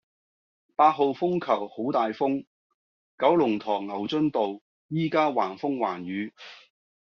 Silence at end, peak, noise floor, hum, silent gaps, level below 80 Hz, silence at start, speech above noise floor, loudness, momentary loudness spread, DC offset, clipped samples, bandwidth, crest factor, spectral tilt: 0.45 s; -6 dBFS; under -90 dBFS; none; 2.47-3.18 s, 4.61-4.89 s; -72 dBFS; 0.8 s; over 65 dB; -26 LUFS; 12 LU; under 0.1%; under 0.1%; 6.8 kHz; 20 dB; -5 dB/octave